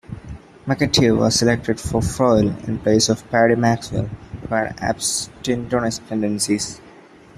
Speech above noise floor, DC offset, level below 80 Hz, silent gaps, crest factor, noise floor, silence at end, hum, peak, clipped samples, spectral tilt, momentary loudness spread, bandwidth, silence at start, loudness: 26 dB; under 0.1%; -42 dBFS; none; 18 dB; -45 dBFS; 0.45 s; none; -2 dBFS; under 0.1%; -4.5 dB/octave; 13 LU; 14 kHz; 0.1 s; -19 LUFS